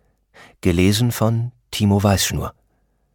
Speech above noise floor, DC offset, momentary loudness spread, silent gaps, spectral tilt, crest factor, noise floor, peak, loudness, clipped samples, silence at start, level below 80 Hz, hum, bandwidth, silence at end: 47 dB; under 0.1%; 11 LU; none; -5 dB/octave; 16 dB; -64 dBFS; -4 dBFS; -19 LUFS; under 0.1%; 0.65 s; -40 dBFS; none; 18 kHz; 0.65 s